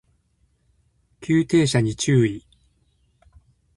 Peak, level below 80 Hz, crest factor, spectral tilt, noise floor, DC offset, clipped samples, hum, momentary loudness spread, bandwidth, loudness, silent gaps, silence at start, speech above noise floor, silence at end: -6 dBFS; -52 dBFS; 18 dB; -6 dB/octave; -65 dBFS; under 0.1%; under 0.1%; none; 14 LU; 11.5 kHz; -20 LUFS; none; 1.2 s; 46 dB; 1.35 s